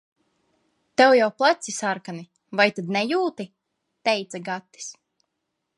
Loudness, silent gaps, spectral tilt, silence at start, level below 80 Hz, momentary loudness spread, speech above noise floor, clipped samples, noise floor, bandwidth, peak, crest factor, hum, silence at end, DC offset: -22 LUFS; none; -3.5 dB/octave; 1 s; -78 dBFS; 21 LU; 57 dB; under 0.1%; -79 dBFS; 11.5 kHz; -4 dBFS; 22 dB; none; 0.85 s; under 0.1%